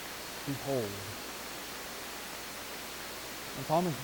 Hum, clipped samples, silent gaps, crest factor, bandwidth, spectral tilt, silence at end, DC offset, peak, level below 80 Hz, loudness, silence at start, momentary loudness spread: none; under 0.1%; none; 20 dB; 19 kHz; -4 dB/octave; 0 s; under 0.1%; -16 dBFS; -62 dBFS; -37 LUFS; 0 s; 8 LU